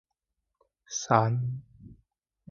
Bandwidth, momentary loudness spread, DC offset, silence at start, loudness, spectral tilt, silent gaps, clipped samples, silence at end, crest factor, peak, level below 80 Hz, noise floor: 7.4 kHz; 13 LU; under 0.1%; 0.9 s; -28 LUFS; -5.5 dB/octave; none; under 0.1%; 0.55 s; 26 dB; -6 dBFS; -64 dBFS; -84 dBFS